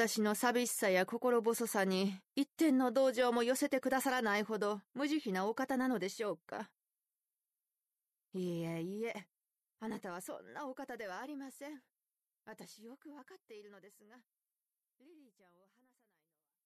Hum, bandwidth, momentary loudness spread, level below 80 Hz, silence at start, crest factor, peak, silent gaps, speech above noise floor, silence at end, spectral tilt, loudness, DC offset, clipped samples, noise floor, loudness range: none; 13.5 kHz; 22 LU; -84 dBFS; 0 s; 20 dB; -18 dBFS; none; over 53 dB; 1.55 s; -4 dB/octave; -36 LUFS; under 0.1%; under 0.1%; under -90 dBFS; 21 LU